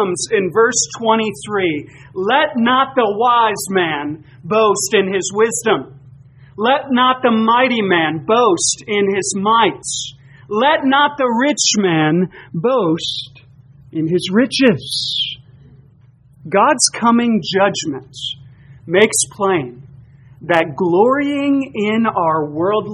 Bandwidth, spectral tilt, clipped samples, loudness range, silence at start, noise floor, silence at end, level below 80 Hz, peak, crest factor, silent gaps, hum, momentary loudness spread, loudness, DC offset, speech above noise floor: 11.5 kHz; -3.5 dB/octave; under 0.1%; 3 LU; 0 s; -48 dBFS; 0 s; -56 dBFS; 0 dBFS; 16 dB; none; none; 10 LU; -15 LUFS; under 0.1%; 32 dB